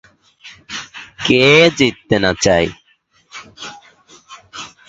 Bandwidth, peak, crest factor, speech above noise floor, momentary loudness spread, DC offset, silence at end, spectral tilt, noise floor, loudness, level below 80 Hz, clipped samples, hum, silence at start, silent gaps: 8.2 kHz; 0 dBFS; 18 dB; 45 dB; 25 LU; under 0.1%; 0.2 s; -4 dB/octave; -57 dBFS; -13 LUFS; -44 dBFS; under 0.1%; none; 0.45 s; none